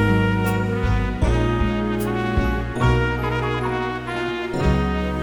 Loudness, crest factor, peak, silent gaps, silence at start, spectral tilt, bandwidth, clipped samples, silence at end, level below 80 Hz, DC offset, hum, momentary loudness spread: -22 LUFS; 14 dB; -6 dBFS; none; 0 s; -7 dB/octave; over 20 kHz; under 0.1%; 0 s; -28 dBFS; under 0.1%; none; 6 LU